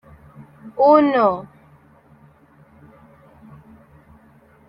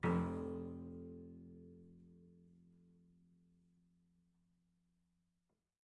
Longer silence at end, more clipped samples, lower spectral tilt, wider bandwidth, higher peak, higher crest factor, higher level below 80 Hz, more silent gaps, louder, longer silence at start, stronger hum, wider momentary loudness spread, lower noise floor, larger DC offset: second, 3.25 s vs 3.4 s; neither; about the same, -8.5 dB/octave vs -9 dB/octave; second, 5.6 kHz vs 9.6 kHz; first, -2 dBFS vs -26 dBFS; about the same, 20 dB vs 24 dB; first, -60 dBFS vs -74 dBFS; neither; first, -16 LUFS vs -45 LUFS; first, 0.65 s vs 0 s; neither; second, 23 LU vs 26 LU; second, -52 dBFS vs -86 dBFS; neither